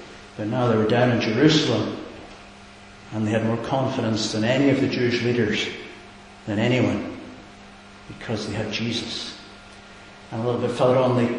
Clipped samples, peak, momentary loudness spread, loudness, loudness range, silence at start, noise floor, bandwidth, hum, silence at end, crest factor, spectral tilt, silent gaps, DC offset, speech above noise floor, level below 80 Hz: under 0.1%; -2 dBFS; 24 LU; -22 LUFS; 7 LU; 0 s; -45 dBFS; 10.5 kHz; none; 0 s; 20 dB; -6 dB/octave; none; under 0.1%; 23 dB; -52 dBFS